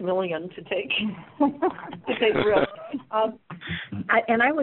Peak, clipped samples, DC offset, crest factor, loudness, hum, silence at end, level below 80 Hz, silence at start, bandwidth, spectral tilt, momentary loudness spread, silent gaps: -6 dBFS; under 0.1%; under 0.1%; 18 dB; -25 LUFS; none; 0 s; -58 dBFS; 0 s; 4.2 kHz; -3 dB/octave; 12 LU; none